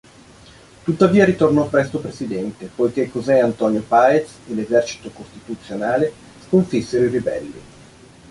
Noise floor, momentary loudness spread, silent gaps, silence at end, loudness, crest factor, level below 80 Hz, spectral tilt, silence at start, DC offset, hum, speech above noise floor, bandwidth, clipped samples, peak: -45 dBFS; 15 LU; none; 0.7 s; -19 LUFS; 18 dB; -52 dBFS; -6.5 dB/octave; 0.85 s; under 0.1%; none; 27 dB; 11.5 kHz; under 0.1%; -2 dBFS